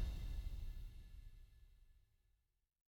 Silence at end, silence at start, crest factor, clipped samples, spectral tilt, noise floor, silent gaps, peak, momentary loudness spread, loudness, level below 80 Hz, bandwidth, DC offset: 1 s; 0 s; 18 dB; under 0.1%; -6 dB/octave; -81 dBFS; none; -32 dBFS; 18 LU; -53 LUFS; -50 dBFS; 17 kHz; under 0.1%